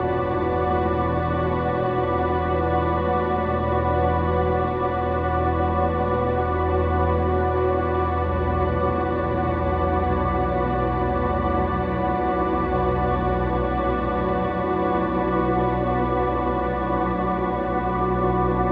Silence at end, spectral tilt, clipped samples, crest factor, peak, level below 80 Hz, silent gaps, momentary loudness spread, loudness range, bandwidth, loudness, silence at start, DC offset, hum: 0 s; -10.5 dB/octave; under 0.1%; 14 dB; -8 dBFS; -32 dBFS; none; 2 LU; 1 LU; 4.8 kHz; -23 LUFS; 0 s; under 0.1%; none